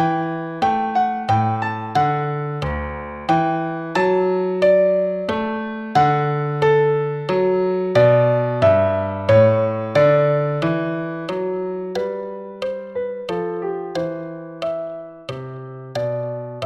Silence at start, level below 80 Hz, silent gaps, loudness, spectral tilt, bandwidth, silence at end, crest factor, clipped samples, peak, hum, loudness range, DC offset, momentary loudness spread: 0 s; -46 dBFS; none; -20 LUFS; -8 dB/octave; 8.6 kHz; 0 s; 16 dB; under 0.1%; -2 dBFS; none; 10 LU; under 0.1%; 13 LU